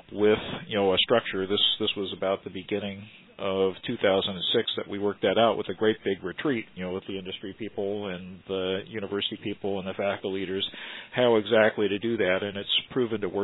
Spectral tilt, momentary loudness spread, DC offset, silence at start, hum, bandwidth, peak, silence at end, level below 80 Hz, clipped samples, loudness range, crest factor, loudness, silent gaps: -8 dB/octave; 12 LU; under 0.1%; 0.1 s; none; 4.1 kHz; -6 dBFS; 0 s; -64 dBFS; under 0.1%; 6 LU; 22 dB; -27 LUFS; none